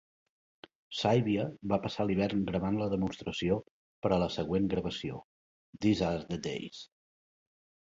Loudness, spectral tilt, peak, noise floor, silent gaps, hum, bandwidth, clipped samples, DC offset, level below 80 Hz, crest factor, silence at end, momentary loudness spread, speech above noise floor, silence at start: -32 LUFS; -6.5 dB/octave; -12 dBFS; under -90 dBFS; 3.71-4.02 s, 5.24-5.73 s; none; 7.8 kHz; under 0.1%; under 0.1%; -56 dBFS; 20 dB; 1 s; 12 LU; over 59 dB; 0.9 s